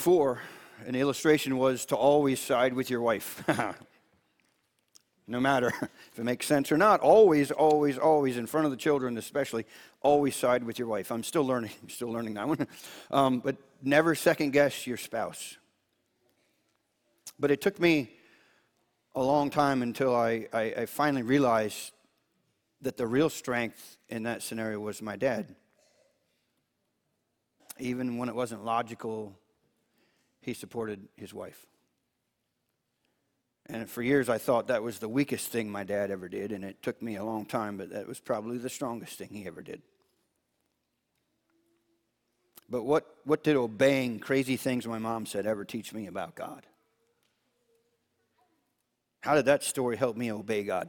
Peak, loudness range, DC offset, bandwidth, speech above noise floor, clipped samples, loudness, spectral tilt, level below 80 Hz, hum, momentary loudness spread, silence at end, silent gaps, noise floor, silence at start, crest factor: -8 dBFS; 14 LU; under 0.1%; 19 kHz; 52 dB; under 0.1%; -29 LUFS; -5 dB/octave; -68 dBFS; none; 15 LU; 0 s; none; -81 dBFS; 0 s; 22 dB